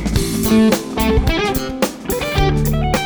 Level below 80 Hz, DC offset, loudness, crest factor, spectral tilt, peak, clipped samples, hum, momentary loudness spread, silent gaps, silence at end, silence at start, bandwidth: -24 dBFS; under 0.1%; -17 LUFS; 14 dB; -5.5 dB/octave; -2 dBFS; under 0.1%; none; 7 LU; none; 0 s; 0 s; over 20 kHz